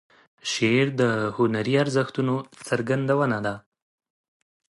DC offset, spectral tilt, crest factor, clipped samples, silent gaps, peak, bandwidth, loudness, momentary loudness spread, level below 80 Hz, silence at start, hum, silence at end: under 0.1%; -5.5 dB/octave; 16 dB; under 0.1%; none; -8 dBFS; 11.5 kHz; -24 LUFS; 9 LU; -64 dBFS; 0.45 s; none; 1.1 s